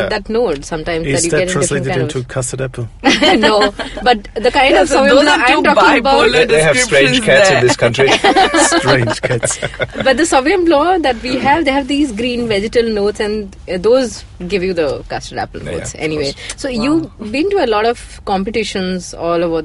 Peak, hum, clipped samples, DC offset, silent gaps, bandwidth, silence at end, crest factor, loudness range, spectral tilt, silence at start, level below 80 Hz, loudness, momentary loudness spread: 0 dBFS; none; under 0.1%; under 0.1%; none; 12 kHz; 0 s; 14 dB; 8 LU; -4 dB/octave; 0 s; -36 dBFS; -13 LUFS; 12 LU